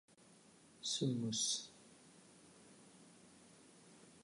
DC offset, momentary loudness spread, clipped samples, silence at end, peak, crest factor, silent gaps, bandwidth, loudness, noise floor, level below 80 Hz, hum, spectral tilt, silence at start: under 0.1%; 25 LU; under 0.1%; 0.05 s; -26 dBFS; 20 dB; none; 11 kHz; -39 LUFS; -66 dBFS; -84 dBFS; none; -3.5 dB/octave; 0.8 s